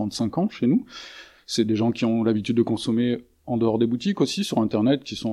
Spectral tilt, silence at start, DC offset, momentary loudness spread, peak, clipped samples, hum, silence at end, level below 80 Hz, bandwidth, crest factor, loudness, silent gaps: -6 dB/octave; 0 s; under 0.1%; 8 LU; -8 dBFS; under 0.1%; none; 0 s; -58 dBFS; 12.5 kHz; 16 dB; -23 LUFS; none